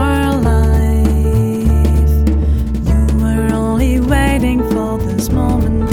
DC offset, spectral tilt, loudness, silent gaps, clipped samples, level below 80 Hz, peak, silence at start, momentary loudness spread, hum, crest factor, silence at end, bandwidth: under 0.1%; -7.5 dB/octave; -14 LUFS; none; under 0.1%; -16 dBFS; 0 dBFS; 0 s; 4 LU; none; 12 dB; 0 s; 15.5 kHz